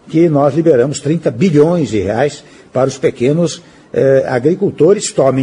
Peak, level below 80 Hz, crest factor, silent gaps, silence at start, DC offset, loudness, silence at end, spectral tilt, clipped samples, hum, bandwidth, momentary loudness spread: 0 dBFS; -50 dBFS; 12 dB; none; 0.05 s; under 0.1%; -13 LUFS; 0 s; -6.5 dB/octave; under 0.1%; none; 11 kHz; 7 LU